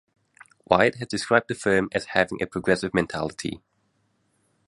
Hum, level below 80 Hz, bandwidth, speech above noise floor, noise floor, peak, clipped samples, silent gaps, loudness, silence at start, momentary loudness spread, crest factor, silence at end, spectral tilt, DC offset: none; -54 dBFS; 11.5 kHz; 46 dB; -70 dBFS; -2 dBFS; under 0.1%; none; -24 LUFS; 0.7 s; 10 LU; 24 dB; 1.1 s; -5 dB/octave; under 0.1%